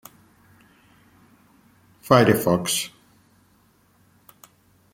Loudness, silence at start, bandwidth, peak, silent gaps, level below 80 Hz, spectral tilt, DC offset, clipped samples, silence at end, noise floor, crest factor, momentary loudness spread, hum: -20 LUFS; 2.05 s; 16.5 kHz; -2 dBFS; none; -60 dBFS; -4.5 dB/octave; under 0.1%; under 0.1%; 2.05 s; -60 dBFS; 26 dB; 17 LU; none